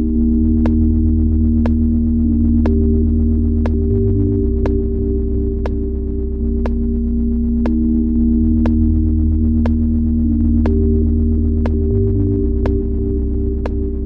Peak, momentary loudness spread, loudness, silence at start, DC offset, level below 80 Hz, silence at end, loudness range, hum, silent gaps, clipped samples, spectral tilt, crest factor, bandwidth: -4 dBFS; 5 LU; -16 LUFS; 0 s; under 0.1%; -18 dBFS; 0 s; 3 LU; none; none; under 0.1%; -12 dB/octave; 10 dB; 2.9 kHz